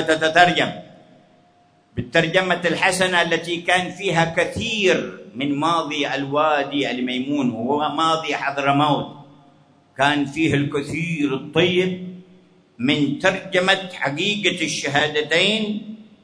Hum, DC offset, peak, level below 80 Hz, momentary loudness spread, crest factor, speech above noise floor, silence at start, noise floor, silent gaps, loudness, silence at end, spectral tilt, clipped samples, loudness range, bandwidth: none; under 0.1%; 0 dBFS; -58 dBFS; 8 LU; 20 dB; 36 dB; 0 s; -56 dBFS; none; -20 LUFS; 0.2 s; -4.5 dB/octave; under 0.1%; 2 LU; 11 kHz